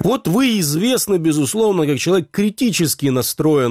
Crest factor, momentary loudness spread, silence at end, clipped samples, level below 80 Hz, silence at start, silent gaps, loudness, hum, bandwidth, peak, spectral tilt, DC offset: 10 dB; 2 LU; 0 s; under 0.1%; -52 dBFS; 0 s; none; -17 LUFS; none; 16 kHz; -6 dBFS; -4.5 dB/octave; under 0.1%